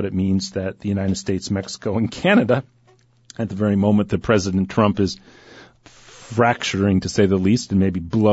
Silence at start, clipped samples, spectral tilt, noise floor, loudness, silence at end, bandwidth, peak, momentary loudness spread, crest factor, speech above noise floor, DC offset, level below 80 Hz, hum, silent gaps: 0 s; under 0.1%; -6 dB/octave; -56 dBFS; -20 LUFS; 0 s; 8 kHz; -4 dBFS; 9 LU; 16 dB; 37 dB; under 0.1%; -48 dBFS; none; none